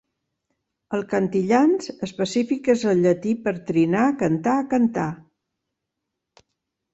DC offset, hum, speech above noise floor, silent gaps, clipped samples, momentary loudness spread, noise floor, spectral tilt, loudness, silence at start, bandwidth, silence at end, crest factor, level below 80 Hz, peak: under 0.1%; none; 61 dB; none; under 0.1%; 10 LU; -82 dBFS; -6.5 dB/octave; -22 LUFS; 0.9 s; 8.2 kHz; 1.75 s; 16 dB; -62 dBFS; -6 dBFS